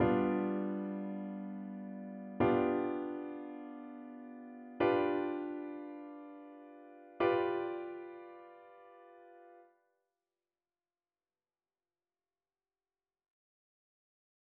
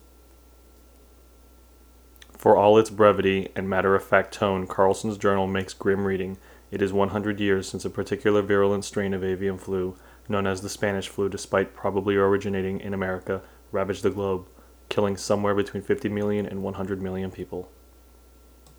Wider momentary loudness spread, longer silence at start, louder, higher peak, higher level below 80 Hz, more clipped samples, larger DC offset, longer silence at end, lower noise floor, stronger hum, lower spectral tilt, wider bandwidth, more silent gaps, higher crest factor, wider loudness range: first, 24 LU vs 11 LU; second, 0 s vs 2.4 s; second, -37 LUFS vs -25 LUFS; second, -18 dBFS vs -2 dBFS; second, -70 dBFS vs -54 dBFS; neither; neither; first, 4.95 s vs 1.1 s; first, under -90 dBFS vs -52 dBFS; neither; about the same, -6 dB/octave vs -6 dB/octave; second, 4.8 kHz vs over 20 kHz; neither; about the same, 20 dB vs 24 dB; about the same, 8 LU vs 6 LU